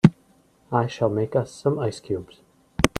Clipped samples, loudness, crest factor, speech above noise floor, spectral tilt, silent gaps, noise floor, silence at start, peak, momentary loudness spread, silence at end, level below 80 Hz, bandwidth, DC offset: under 0.1%; -25 LUFS; 24 dB; 34 dB; -6.5 dB/octave; none; -59 dBFS; 0.05 s; 0 dBFS; 9 LU; 0.1 s; -46 dBFS; 15.5 kHz; under 0.1%